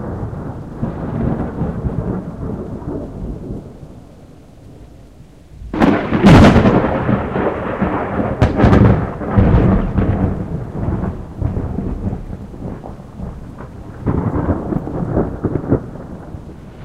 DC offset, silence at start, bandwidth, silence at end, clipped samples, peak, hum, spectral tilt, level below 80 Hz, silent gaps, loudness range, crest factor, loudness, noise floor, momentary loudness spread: 0.3%; 0 s; 11 kHz; 0 s; under 0.1%; 0 dBFS; none; -8.5 dB/octave; -26 dBFS; none; 13 LU; 16 dB; -16 LUFS; -41 dBFS; 20 LU